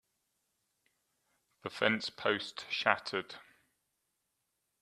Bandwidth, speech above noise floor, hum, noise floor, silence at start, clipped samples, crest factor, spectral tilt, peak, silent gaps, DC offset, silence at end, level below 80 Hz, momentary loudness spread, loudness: 13.5 kHz; 49 dB; none; -83 dBFS; 1.65 s; under 0.1%; 30 dB; -3.5 dB/octave; -10 dBFS; none; under 0.1%; 1.4 s; -80 dBFS; 16 LU; -33 LUFS